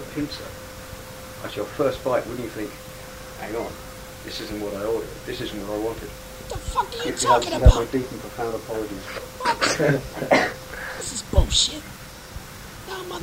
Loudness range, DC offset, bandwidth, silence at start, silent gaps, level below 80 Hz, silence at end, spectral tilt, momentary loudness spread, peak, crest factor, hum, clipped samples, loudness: 8 LU; under 0.1%; 16 kHz; 0 s; none; -30 dBFS; 0 s; -4 dB/octave; 18 LU; 0 dBFS; 24 dB; none; under 0.1%; -25 LUFS